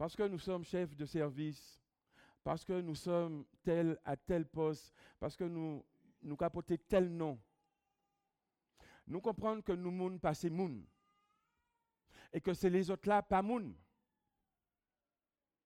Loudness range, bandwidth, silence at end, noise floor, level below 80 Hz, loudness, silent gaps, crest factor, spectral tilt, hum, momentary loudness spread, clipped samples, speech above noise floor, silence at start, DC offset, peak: 3 LU; 16 kHz; 1.9 s; under -90 dBFS; -64 dBFS; -39 LUFS; none; 22 dB; -7 dB/octave; none; 12 LU; under 0.1%; over 52 dB; 0 s; under 0.1%; -20 dBFS